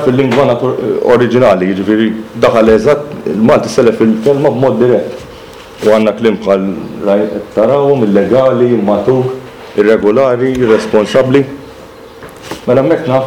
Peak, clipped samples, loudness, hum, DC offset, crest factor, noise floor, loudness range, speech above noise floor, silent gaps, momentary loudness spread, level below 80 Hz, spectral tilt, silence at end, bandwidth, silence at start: 0 dBFS; under 0.1%; -10 LUFS; none; 0.2%; 10 dB; -32 dBFS; 2 LU; 23 dB; none; 10 LU; -42 dBFS; -7 dB/octave; 0 s; 16 kHz; 0 s